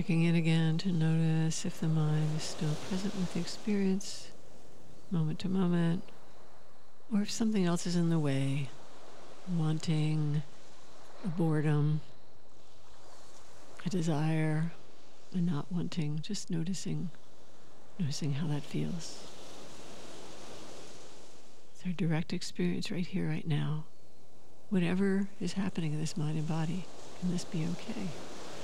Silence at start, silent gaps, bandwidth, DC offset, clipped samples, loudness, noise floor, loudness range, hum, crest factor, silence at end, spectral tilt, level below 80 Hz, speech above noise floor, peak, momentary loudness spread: 0 s; none; 12 kHz; 2%; under 0.1%; -33 LUFS; -62 dBFS; 7 LU; none; 16 dB; 0 s; -6.5 dB/octave; -70 dBFS; 29 dB; -18 dBFS; 19 LU